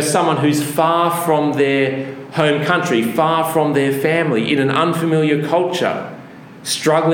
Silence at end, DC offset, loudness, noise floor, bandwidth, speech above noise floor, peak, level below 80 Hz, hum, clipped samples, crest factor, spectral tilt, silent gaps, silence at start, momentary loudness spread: 0 s; under 0.1%; -16 LUFS; -37 dBFS; 18 kHz; 21 dB; -2 dBFS; -66 dBFS; none; under 0.1%; 14 dB; -5 dB/octave; none; 0 s; 6 LU